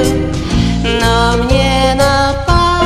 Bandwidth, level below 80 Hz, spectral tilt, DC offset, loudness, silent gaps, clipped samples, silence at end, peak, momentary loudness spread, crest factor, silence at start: 14.5 kHz; -18 dBFS; -5 dB/octave; under 0.1%; -12 LUFS; none; 0.2%; 0 s; 0 dBFS; 4 LU; 12 dB; 0 s